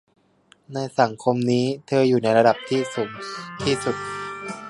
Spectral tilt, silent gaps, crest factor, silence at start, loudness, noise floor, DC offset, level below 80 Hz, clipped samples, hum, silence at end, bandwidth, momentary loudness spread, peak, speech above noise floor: -5.5 dB/octave; none; 20 dB; 0.7 s; -22 LUFS; -58 dBFS; under 0.1%; -58 dBFS; under 0.1%; none; 0 s; 11.5 kHz; 13 LU; -2 dBFS; 37 dB